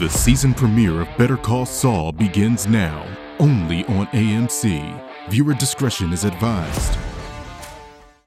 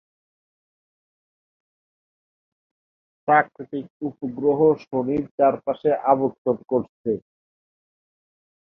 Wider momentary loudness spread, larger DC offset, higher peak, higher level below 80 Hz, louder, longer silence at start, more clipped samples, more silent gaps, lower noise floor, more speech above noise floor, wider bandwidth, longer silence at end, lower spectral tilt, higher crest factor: first, 16 LU vs 11 LU; neither; first, 0 dBFS vs -4 dBFS; first, -32 dBFS vs -64 dBFS; first, -19 LUFS vs -22 LUFS; second, 0 s vs 3.25 s; neither; second, none vs 3.90-4.00 s, 5.31-5.38 s, 6.38-6.45 s, 6.89-7.04 s; second, -43 dBFS vs under -90 dBFS; second, 25 dB vs over 68 dB; first, 15.5 kHz vs 5.8 kHz; second, 0.35 s vs 1.55 s; second, -5.5 dB/octave vs -9.5 dB/octave; about the same, 18 dB vs 22 dB